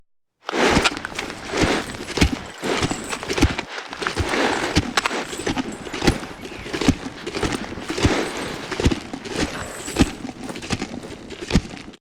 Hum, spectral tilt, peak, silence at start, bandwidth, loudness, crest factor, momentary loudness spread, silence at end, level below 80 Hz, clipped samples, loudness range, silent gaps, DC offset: none; -4.5 dB/octave; -2 dBFS; 0.45 s; 19.5 kHz; -23 LUFS; 22 dB; 10 LU; 0.05 s; -34 dBFS; under 0.1%; 3 LU; none; under 0.1%